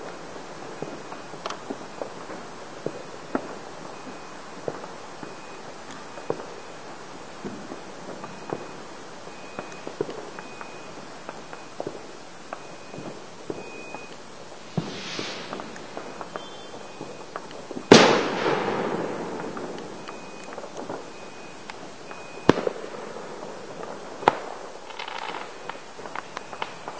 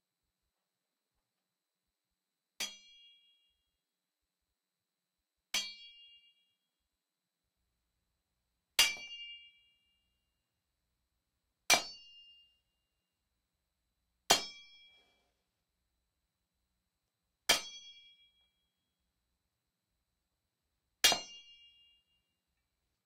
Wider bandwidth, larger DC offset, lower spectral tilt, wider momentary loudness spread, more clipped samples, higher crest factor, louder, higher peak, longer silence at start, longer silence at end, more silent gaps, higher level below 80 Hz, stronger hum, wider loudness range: second, 8 kHz vs 13.5 kHz; first, 0.6% vs under 0.1%; first, -4 dB/octave vs 1 dB/octave; second, 15 LU vs 24 LU; neither; about the same, 30 dB vs 34 dB; about the same, -30 LUFS vs -32 LUFS; first, 0 dBFS vs -8 dBFS; second, 0 s vs 2.6 s; second, 0 s vs 1.65 s; neither; first, -60 dBFS vs -74 dBFS; neither; first, 16 LU vs 13 LU